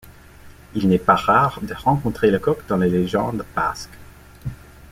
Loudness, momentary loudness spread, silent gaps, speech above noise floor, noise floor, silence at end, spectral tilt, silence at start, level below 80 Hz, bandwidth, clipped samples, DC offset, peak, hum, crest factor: -20 LUFS; 18 LU; none; 24 dB; -44 dBFS; 0.05 s; -7 dB/octave; 0.05 s; -44 dBFS; 16 kHz; under 0.1%; under 0.1%; -2 dBFS; none; 20 dB